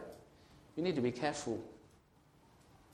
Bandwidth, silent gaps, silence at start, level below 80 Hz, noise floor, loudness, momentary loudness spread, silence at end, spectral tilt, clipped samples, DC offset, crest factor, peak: 13.5 kHz; none; 0 s; -70 dBFS; -67 dBFS; -38 LUFS; 19 LU; 1.05 s; -5.5 dB/octave; under 0.1%; under 0.1%; 20 dB; -20 dBFS